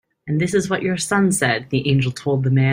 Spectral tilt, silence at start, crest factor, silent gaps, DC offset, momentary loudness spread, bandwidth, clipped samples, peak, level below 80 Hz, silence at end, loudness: -5.5 dB/octave; 0.25 s; 16 dB; none; under 0.1%; 4 LU; 16 kHz; under 0.1%; -2 dBFS; -52 dBFS; 0 s; -19 LUFS